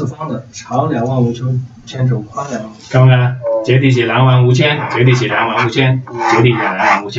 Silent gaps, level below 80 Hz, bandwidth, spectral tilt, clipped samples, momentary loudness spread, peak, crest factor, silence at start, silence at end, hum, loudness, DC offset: none; -50 dBFS; 7.6 kHz; -6.5 dB/octave; under 0.1%; 12 LU; 0 dBFS; 12 dB; 0 s; 0 s; none; -13 LUFS; under 0.1%